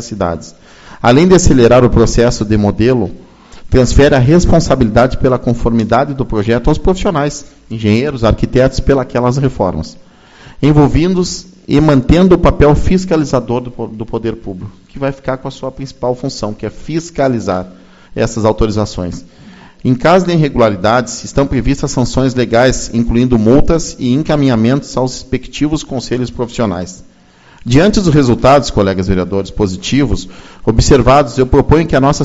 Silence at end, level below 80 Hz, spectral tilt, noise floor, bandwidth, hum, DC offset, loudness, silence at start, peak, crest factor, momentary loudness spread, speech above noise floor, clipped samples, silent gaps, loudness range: 0 s; -24 dBFS; -6.5 dB/octave; -43 dBFS; 8 kHz; none; under 0.1%; -12 LUFS; 0 s; 0 dBFS; 12 dB; 12 LU; 32 dB; 0.6%; none; 7 LU